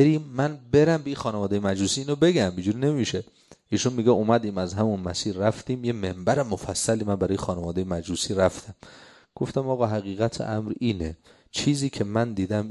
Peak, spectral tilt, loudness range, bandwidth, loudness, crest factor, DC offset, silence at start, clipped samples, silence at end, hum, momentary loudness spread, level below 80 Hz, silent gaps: -6 dBFS; -5.5 dB/octave; 4 LU; 12 kHz; -25 LUFS; 20 dB; under 0.1%; 0 s; under 0.1%; 0 s; none; 8 LU; -48 dBFS; none